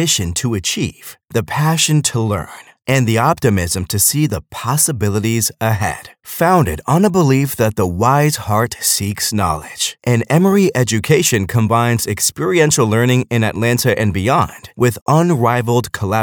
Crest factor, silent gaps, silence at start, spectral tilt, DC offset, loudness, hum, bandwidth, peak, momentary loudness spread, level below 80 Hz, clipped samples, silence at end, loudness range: 14 dB; 15.02-15.06 s; 0 s; -4.5 dB/octave; under 0.1%; -15 LUFS; none; over 20 kHz; 0 dBFS; 7 LU; -42 dBFS; under 0.1%; 0 s; 2 LU